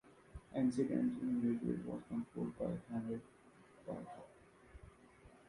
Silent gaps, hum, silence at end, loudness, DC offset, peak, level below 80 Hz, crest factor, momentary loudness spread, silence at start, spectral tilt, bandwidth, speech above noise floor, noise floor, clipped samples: none; none; 0.1 s; -41 LUFS; under 0.1%; -24 dBFS; -66 dBFS; 18 dB; 24 LU; 0.05 s; -8.5 dB/octave; 11.5 kHz; 24 dB; -63 dBFS; under 0.1%